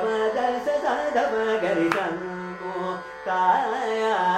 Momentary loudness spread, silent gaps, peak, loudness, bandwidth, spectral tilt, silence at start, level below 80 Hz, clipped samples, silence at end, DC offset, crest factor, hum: 10 LU; none; -6 dBFS; -24 LUFS; 14 kHz; -5 dB/octave; 0 s; -62 dBFS; under 0.1%; 0 s; under 0.1%; 18 dB; none